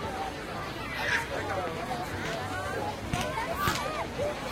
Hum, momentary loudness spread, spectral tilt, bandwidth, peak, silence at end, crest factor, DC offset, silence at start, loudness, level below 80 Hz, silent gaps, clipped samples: none; 6 LU; -4 dB/octave; 16 kHz; -10 dBFS; 0 s; 22 dB; under 0.1%; 0 s; -32 LUFS; -48 dBFS; none; under 0.1%